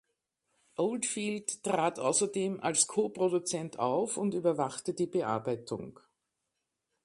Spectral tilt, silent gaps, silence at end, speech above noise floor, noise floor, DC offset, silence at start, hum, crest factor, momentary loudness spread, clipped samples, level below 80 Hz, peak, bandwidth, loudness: -4 dB/octave; none; 1.15 s; 53 dB; -85 dBFS; under 0.1%; 0.8 s; none; 22 dB; 8 LU; under 0.1%; -76 dBFS; -12 dBFS; 11.5 kHz; -31 LUFS